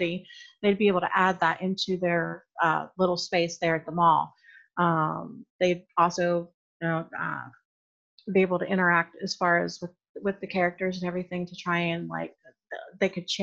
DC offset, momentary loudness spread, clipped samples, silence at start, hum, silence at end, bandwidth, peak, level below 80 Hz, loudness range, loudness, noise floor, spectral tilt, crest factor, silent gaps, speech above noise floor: under 0.1%; 15 LU; under 0.1%; 0 s; none; 0 s; 7.8 kHz; -8 dBFS; -68 dBFS; 4 LU; -27 LUFS; under -90 dBFS; -5.5 dB/octave; 20 dB; 5.50-5.59 s, 6.54-6.80 s, 7.65-8.18 s, 10.09-10.15 s; over 63 dB